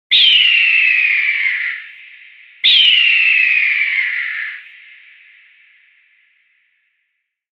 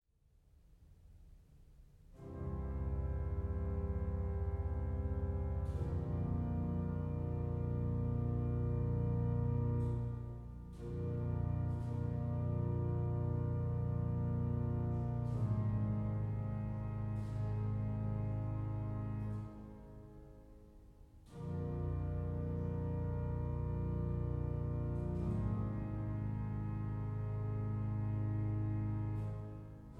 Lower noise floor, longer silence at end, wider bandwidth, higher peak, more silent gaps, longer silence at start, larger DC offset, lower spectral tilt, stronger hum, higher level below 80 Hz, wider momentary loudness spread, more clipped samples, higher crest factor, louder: about the same, -71 dBFS vs -70 dBFS; first, 2.9 s vs 0 s; first, 8.8 kHz vs 3.3 kHz; first, 0 dBFS vs -26 dBFS; neither; second, 0.1 s vs 0.7 s; neither; second, 2 dB/octave vs -11 dB/octave; neither; second, -70 dBFS vs -46 dBFS; first, 15 LU vs 7 LU; neither; about the same, 16 dB vs 12 dB; first, -11 LUFS vs -39 LUFS